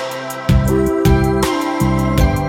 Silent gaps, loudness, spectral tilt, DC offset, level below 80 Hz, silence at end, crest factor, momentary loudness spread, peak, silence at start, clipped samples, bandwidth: none; -16 LUFS; -6.5 dB/octave; under 0.1%; -22 dBFS; 0 s; 14 dB; 3 LU; -2 dBFS; 0 s; under 0.1%; 17 kHz